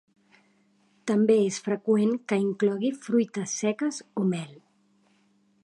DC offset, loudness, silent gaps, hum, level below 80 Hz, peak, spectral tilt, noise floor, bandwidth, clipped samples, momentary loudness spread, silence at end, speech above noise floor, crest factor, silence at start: under 0.1%; -26 LUFS; none; none; -78 dBFS; -10 dBFS; -5.5 dB/octave; -66 dBFS; 11.5 kHz; under 0.1%; 8 LU; 1.1 s; 40 dB; 18 dB; 1.05 s